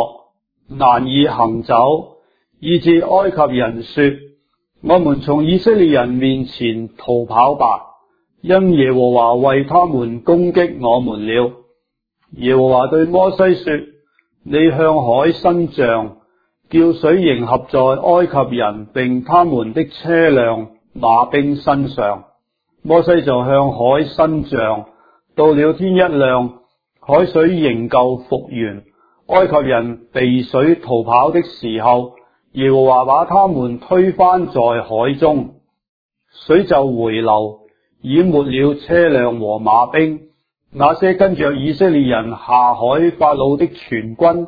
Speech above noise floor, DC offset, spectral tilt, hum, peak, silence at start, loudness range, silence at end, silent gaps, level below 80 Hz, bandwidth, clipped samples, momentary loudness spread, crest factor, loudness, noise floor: 56 dB; under 0.1%; -9.5 dB/octave; none; 0 dBFS; 0 s; 2 LU; 0 s; 35.89-36.09 s; -46 dBFS; 5 kHz; under 0.1%; 9 LU; 14 dB; -14 LUFS; -69 dBFS